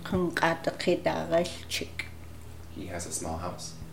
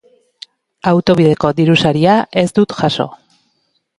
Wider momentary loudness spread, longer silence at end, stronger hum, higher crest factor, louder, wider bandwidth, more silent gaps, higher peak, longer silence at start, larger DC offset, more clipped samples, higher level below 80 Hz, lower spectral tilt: first, 16 LU vs 7 LU; second, 0 s vs 0.85 s; neither; first, 22 dB vs 14 dB; second, -31 LUFS vs -13 LUFS; first, 17 kHz vs 11.5 kHz; neither; second, -8 dBFS vs 0 dBFS; second, 0 s vs 0.85 s; first, 0.5% vs under 0.1%; neither; about the same, -50 dBFS vs -48 dBFS; second, -4.5 dB/octave vs -6.5 dB/octave